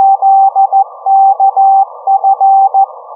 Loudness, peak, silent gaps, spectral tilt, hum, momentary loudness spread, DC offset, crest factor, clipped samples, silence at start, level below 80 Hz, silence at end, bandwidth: -8 LUFS; -2 dBFS; none; -4.5 dB/octave; none; 4 LU; under 0.1%; 8 dB; under 0.1%; 0 s; under -90 dBFS; 0 s; 1.3 kHz